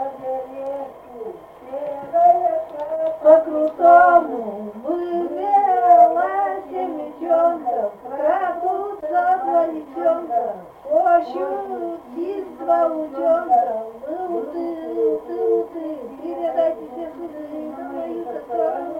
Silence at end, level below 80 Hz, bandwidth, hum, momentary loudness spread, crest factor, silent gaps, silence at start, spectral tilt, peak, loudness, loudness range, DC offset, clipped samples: 0 s; -62 dBFS; 4.3 kHz; none; 17 LU; 18 dB; none; 0 s; -7 dB/octave; 0 dBFS; -20 LUFS; 8 LU; under 0.1%; under 0.1%